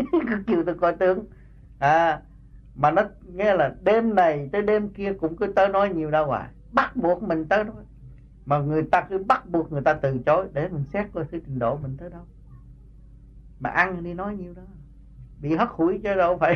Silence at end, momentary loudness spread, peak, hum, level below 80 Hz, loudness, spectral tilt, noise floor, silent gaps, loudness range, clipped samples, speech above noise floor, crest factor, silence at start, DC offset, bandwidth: 0 s; 11 LU; -6 dBFS; none; -48 dBFS; -23 LUFS; -8 dB/octave; -47 dBFS; none; 8 LU; under 0.1%; 24 dB; 18 dB; 0 s; under 0.1%; 6.8 kHz